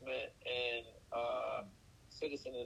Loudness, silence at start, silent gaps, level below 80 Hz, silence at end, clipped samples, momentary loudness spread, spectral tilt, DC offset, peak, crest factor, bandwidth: -41 LUFS; 0 s; none; -70 dBFS; 0 s; under 0.1%; 8 LU; -4 dB/octave; under 0.1%; -26 dBFS; 16 dB; 13.5 kHz